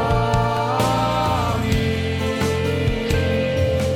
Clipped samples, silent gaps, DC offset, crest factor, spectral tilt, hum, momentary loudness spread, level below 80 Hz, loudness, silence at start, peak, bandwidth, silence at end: under 0.1%; none; under 0.1%; 14 dB; -6 dB/octave; none; 3 LU; -32 dBFS; -20 LUFS; 0 s; -4 dBFS; 17.5 kHz; 0 s